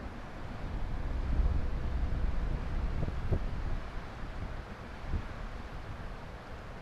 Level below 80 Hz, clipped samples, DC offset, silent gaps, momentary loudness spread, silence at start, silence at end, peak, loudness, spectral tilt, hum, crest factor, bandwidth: -36 dBFS; under 0.1%; under 0.1%; none; 10 LU; 0 s; 0 s; -16 dBFS; -39 LUFS; -7.5 dB/octave; none; 18 dB; 7.6 kHz